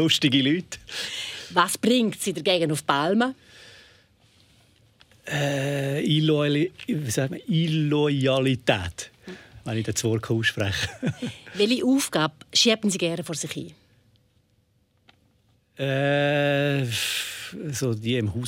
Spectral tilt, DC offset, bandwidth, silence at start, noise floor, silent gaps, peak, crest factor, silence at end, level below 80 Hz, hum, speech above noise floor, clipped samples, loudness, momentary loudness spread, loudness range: -4.5 dB/octave; under 0.1%; 16 kHz; 0 s; -66 dBFS; none; -4 dBFS; 22 dB; 0 s; -60 dBFS; none; 42 dB; under 0.1%; -24 LUFS; 12 LU; 5 LU